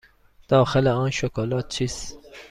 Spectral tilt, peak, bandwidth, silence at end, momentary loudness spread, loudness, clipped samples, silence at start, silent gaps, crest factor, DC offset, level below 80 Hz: -5.5 dB/octave; -6 dBFS; 11.5 kHz; 0.05 s; 16 LU; -23 LUFS; under 0.1%; 0.5 s; none; 18 dB; under 0.1%; -46 dBFS